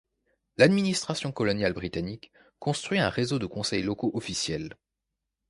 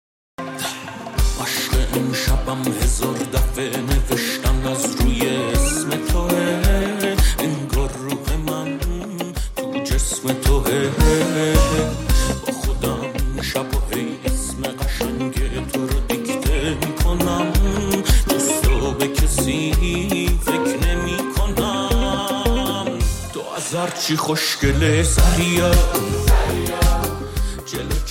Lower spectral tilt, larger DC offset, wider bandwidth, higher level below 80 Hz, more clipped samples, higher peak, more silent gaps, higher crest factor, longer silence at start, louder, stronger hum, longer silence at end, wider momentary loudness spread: about the same, -5 dB/octave vs -4.5 dB/octave; neither; second, 11.5 kHz vs 17 kHz; second, -54 dBFS vs -22 dBFS; neither; about the same, -6 dBFS vs -4 dBFS; neither; first, 24 dB vs 14 dB; first, 0.6 s vs 0.4 s; second, -28 LUFS vs -20 LUFS; neither; first, 0.75 s vs 0 s; first, 13 LU vs 8 LU